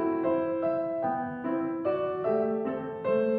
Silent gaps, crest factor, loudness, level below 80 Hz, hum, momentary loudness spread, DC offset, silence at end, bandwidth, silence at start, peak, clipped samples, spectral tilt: none; 14 dB; -30 LUFS; -70 dBFS; none; 4 LU; under 0.1%; 0 s; 4.6 kHz; 0 s; -16 dBFS; under 0.1%; -10 dB/octave